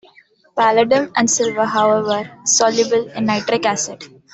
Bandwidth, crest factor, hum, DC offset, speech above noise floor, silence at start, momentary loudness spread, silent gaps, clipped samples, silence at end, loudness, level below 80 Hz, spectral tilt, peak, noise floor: 8.4 kHz; 16 dB; none; under 0.1%; 35 dB; 0.55 s; 8 LU; none; under 0.1%; 0.25 s; -16 LUFS; -60 dBFS; -2.5 dB/octave; -2 dBFS; -51 dBFS